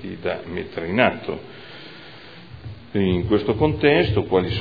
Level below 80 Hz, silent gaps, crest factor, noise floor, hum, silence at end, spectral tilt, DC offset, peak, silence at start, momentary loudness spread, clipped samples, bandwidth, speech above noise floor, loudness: -42 dBFS; none; 22 dB; -42 dBFS; none; 0 s; -9 dB/octave; 0.4%; 0 dBFS; 0 s; 22 LU; under 0.1%; 5 kHz; 21 dB; -21 LUFS